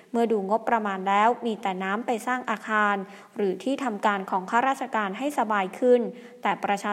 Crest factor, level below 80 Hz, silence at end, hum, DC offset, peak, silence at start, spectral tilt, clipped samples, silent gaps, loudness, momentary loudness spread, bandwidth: 18 dB; -80 dBFS; 0 s; none; under 0.1%; -8 dBFS; 0.15 s; -5 dB/octave; under 0.1%; none; -26 LUFS; 7 LU; 15 kHz